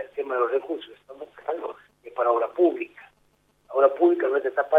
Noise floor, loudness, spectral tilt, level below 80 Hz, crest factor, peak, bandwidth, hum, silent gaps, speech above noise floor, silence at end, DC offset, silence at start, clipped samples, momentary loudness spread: -65 dBFS; -24 LUFS; -6 dB/octave; -74 dBFS; 20 dB; -4 dBFS; 3.9 kHz; 50 Hz at -70 dBFS; none; 42 dB; 0 s; under 0.1%; 0 s; under 0.1%; 18 LU